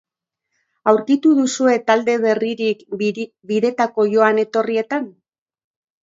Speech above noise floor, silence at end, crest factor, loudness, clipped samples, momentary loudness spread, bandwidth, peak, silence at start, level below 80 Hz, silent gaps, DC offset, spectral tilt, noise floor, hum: 61 dB; 0.9 s; 18 dB; -18 LUFS; under 0.1%; 8 LU; 7.8 kHz; 0 dBFS; 0.85 s; -70 dBFS; none; under 0.1%; -4.5 dB/octave; -78 dBFS; none